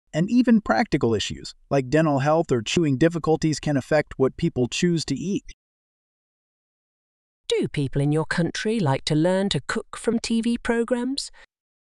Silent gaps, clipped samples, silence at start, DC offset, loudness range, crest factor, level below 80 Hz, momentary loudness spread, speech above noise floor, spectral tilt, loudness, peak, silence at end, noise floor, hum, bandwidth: 5.53-7.44 s; under 0.1%; 0.15 s; under 0.1%; 7 LU; 16 dB; -48 dBFS; 7 LU; over 68 dB; -5.5 dB/octave; -23 LUFS; -6 dBFS; 0.65 s; under -90 dBFS; none; 11.5 kHz